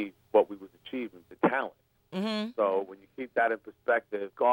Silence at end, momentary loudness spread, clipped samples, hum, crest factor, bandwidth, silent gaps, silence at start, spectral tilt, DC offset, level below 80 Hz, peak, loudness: 0 s; 13 LU; under 0.1%; none; 20 dB; 16.5 kHz; none; 0 s; -6.5 dB/octave; under 0.1%; -76 dBFS; -10 dBFS; -30 LUFS